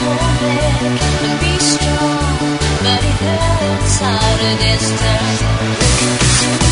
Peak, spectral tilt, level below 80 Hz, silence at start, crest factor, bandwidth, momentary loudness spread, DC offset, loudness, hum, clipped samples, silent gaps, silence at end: 0 dBFS; -4 dB/octave; -22 dBFS; 0 s; 14 dB; 11 kHz; 4 LU; under 0.1%; -14 LUFS; none; under 0.1%; none; 0 s